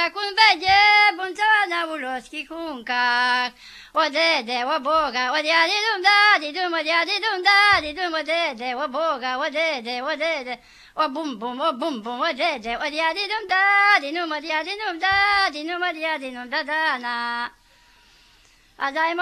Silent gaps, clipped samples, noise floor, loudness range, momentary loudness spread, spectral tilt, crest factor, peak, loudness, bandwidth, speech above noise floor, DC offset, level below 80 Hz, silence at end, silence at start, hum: none; under 0.1%; -55 dBFS; 7 LU; 13 LU; -1.5 dB/octave; 20 dB; -2 dBFS; -20 LUFS; 14 kHz; 34 dB; under 0.1%; -58 dBFS; 0 s; 0 s; none